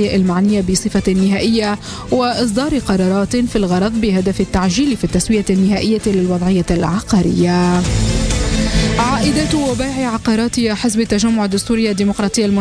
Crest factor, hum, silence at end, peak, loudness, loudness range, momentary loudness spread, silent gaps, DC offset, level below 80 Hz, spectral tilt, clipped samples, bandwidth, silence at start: 12 dB; none; 0 s; -4 dBFS; -15 LUFS; 1 LU; 3 LU; none; under 0.1%; -28 dBFS; -5.5 dB/octave; under 0.1%; 11 kHz; 0 s